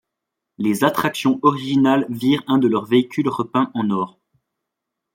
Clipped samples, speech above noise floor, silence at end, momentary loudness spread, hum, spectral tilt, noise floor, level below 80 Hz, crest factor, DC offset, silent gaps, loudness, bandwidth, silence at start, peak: under 0.1%; 63 dB; 1.05 s; 6 LU; none; -6 dB/octave; -81 dBFS; -64 dBFS; 18 dB; under 0.1%; none; -19 LUFS; 16.5 kHz; 0.6 s; -2 dBFS